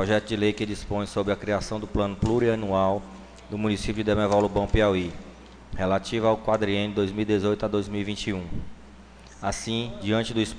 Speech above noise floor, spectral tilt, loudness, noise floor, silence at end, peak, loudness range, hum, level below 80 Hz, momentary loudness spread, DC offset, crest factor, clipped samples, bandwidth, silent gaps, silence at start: 22 dB; -6 dB/octave; -26 LUFS; -47 dBFS; 0 s; -10 dBFS; 4 LU; none; -40 dBFS; 11 LU; under 0.1%; 16 dB; under 0.1%; 10 kHz; none; 0 s